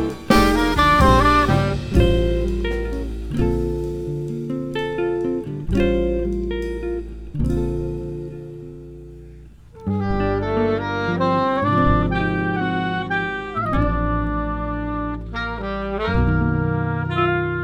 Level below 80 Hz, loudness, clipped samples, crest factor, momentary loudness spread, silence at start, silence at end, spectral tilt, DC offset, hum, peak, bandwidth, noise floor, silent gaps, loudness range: -28 dBFS; -21 LUFS; under 0.1%; 20 dB; 12 LU; 0 s; 0 s; -7 dB/octave; under 0.1%; none; 0 dBFS; 17.5 kHz; -42 dBFS; none; 8 LU